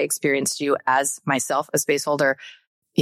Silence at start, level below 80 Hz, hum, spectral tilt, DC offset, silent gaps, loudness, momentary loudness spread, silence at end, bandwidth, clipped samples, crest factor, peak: 0 s; -76 dBFS; none; -3 dB/octave; under 0.1%; 2.67-2.82 s; -22 LUFS; 3 LU; 0 s; 16.5 kHz; under 0.1%; 16 dB; -6 dBFS